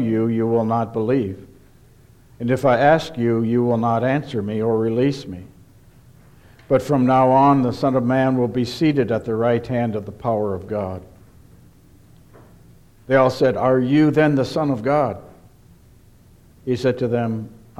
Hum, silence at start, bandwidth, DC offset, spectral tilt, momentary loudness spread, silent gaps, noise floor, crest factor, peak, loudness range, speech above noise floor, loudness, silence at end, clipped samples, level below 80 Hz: none; 0 s; 14 kHz; under 0.1%; -8 dB/octave; 11 LU; none; -49 dBFS; 16 dB; -4 dBFS; 6 LU; 31 dB; -19 LUFS; 0.25 s; under 0.1%; -52 dBFS